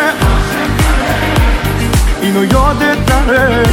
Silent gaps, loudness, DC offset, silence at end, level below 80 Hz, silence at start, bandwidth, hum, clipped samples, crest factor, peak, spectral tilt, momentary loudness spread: none; -12 LUFS; under 0.1%; 0 s; -16 dBFS; 0 s; 17.5 kHz; none; under 0.1%; 10 dB; 0 dBFS; -5.5 dB/octave; 3 LU